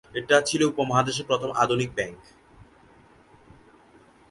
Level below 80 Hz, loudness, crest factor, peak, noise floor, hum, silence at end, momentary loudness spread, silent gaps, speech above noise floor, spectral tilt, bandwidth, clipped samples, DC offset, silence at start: -58 dBFS; -24 LUFS; 22 dB; -6 dBFS; -55 dBFS; none; 2.15 s; 8 LU; none; 31 dB; -4 dB/octave; 11.5 kHz; under 0.1%; under 0.1%; 0.15 s